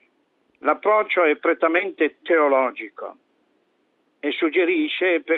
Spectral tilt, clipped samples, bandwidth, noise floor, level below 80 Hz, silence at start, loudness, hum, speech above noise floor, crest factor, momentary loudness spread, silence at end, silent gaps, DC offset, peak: -5.5 dB/octave; under 0.1%; 4.2 kHz; -67 dBFS; -78 dBFS; 0.65 s; -20 LUFS; none; 46 dB; 18 dB; 13 LU; 0 s; none; under 0.1%; -4 dBFS